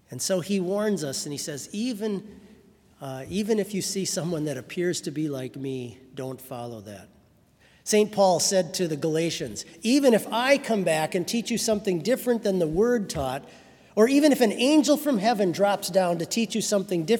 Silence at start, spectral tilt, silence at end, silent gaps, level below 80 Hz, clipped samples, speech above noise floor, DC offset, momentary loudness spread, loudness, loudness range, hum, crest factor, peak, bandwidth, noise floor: 0.1 s; -4.5 dB/octave; 0 s; none; -60 dBFS; under 0.1%; 34 dB; under 0.1%; 15 LU; -25 LUFS; 8 LU; none; 20 dB; -6 dBFS; 18 kHz; -59 dBFS